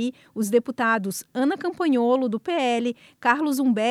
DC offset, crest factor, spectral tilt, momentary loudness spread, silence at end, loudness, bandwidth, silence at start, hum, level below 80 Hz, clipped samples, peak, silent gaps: under 0.1%; 18 dB; -4.5 dB/octave; 7 LU; 0 s; -23 LUFS; 15.5 kHz; 0 s; none; -74 dBFS; under 0.1%; -6 dBFS; none